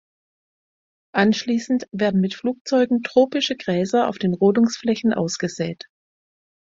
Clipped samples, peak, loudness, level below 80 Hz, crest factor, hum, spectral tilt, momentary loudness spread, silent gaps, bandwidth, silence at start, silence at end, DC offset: under 0.1%; -2 dBFS; -21 LUFS; -62 dBFS; 20 dB; none; -5.5 dB/octave; 8 LU; 2.61-2.65 s; 7.8 kHz; 1.15 s; 0.95 s; under 0.1%